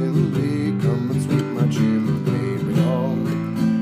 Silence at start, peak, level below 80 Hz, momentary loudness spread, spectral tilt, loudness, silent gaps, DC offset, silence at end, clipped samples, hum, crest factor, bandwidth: 0 s; -6 dBFS; -54 dBFS; 3 LU; -8 dB/octave; -21 LUFS; none; under 0.1%; 0 s; under 0.1%; none; 14 dB; 15 kHz